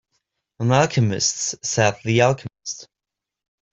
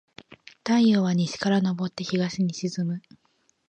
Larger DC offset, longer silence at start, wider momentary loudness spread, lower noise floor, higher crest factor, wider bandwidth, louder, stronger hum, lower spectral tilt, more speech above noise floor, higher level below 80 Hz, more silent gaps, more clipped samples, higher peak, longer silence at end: neither; about the same, 0.6 s vs 0.65 s; first, 14 LU vs 10 LU; first, -86 dBFS vs -68 dBFS; about the same, 20 dB vs 16 dB; about the same, 8.2 kHz vs 8.8 kHz; first, -20 LUFS vs -25 LUFS; neither; second, -4 dB/octave vs -6 dB/octave; first, 67 dB vs 44 dB; first, -56 dBFS vs -68 dBFS; neither; neither; first, -2 dBFS vs -10 dBFS; first, 0.9 s vs 0.7 s